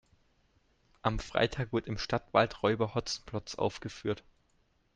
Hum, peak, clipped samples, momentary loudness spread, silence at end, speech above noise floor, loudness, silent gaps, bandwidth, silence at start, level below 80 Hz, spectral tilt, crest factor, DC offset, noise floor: none; -12 dBFS; under 0.1%; 9 LU; 0.8 s; 39 dB; -33 LUFS; none; 9.8 kHz; 1.05 s; -52 dBFS; -5 dB/octave; 22 dB; under 0.1%; -71 dBFS